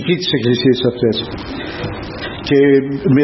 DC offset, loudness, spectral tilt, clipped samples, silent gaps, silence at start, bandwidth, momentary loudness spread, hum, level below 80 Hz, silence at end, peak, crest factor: under 0.1%; -16 LUFS; -7 dB/octave; under 0.1%; none; 0 s; 6 kHz; 13 LU; none; -40 dBFS; 0 s; -2 dBFS; 14 dB